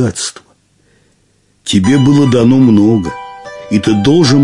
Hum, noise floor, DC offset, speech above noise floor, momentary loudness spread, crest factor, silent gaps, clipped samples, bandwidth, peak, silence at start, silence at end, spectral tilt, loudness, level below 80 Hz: none; -54 dBFS; under 0.1%; 46 dB; 17 LU; 10 dB; none; under 0.1%; 11.5 kHz; 0 dBFS; 0 s; 0 s; -6 dB/octave; -10 LUFS; -44 dBFS